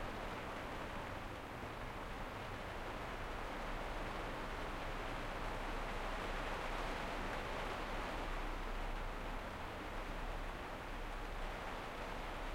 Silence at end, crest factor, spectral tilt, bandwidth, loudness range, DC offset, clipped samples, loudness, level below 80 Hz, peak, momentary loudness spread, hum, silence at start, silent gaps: 0 s; 16 dB; -4.5 dB/octave; 16.5 kHz; 3 LU; under 0.1%; under 0.1%; -45 LUFS; -48 dBFS; -28 dBFS; 4 LU; none; 0 s; none